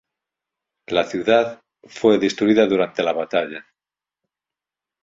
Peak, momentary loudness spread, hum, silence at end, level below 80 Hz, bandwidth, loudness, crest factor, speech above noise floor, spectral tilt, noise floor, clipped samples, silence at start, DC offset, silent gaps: -2 dBFS; 8 LU; none; 1.45 s; -62 dBFS; 7.8 kHz; -19 LUFS; 20 dB; 71 dB; -5 dB/octave; -90 dBFS; under 0.1%; 0.9 s; under 0.1%; none